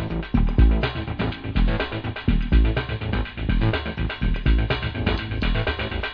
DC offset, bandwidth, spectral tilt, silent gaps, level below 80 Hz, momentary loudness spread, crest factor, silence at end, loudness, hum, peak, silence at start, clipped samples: under 0.1%; 5.2 kHz; -8.5 dB/octave; none; -24 dBFS; 7 LU; 16 dB; 0 s; -24 LUFS; none; -6 dBFS; 0 s; under 0.1%